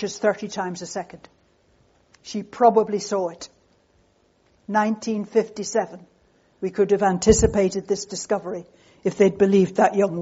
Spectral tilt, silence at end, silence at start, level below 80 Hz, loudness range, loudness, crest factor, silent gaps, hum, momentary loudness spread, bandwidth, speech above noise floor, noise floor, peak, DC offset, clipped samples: -5.5 dB/octave; 0 s; 0 s; -44 dBFS; 6 LU; -22 LUFS; 20 dB; none; none; 16 LU; 8 kHz; 41 dB; -62 dBFS; -2 dBFS; under 0.1%; under 0.1%